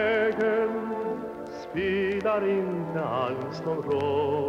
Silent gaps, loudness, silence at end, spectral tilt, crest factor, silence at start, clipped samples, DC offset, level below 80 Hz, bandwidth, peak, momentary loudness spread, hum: none; -28 LUFS; 0 s; -7 dB/octave; 12 dB; 0 s; under 0.1%; under 0.1%; -60 dBFS; 7.6 kHz; -14 dBFS; 8 LU; none